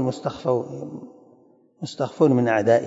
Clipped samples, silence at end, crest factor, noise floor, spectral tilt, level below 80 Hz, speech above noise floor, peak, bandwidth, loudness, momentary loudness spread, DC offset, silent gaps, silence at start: under 0.1%; 0 s; 18 dB; -56 dBFS; -7 dB/octave; -66 dBFS; 34 dB; -6 dBFS; 8 kHz; -22 LUFS; 18 LU; under 0.1%; none; 0 s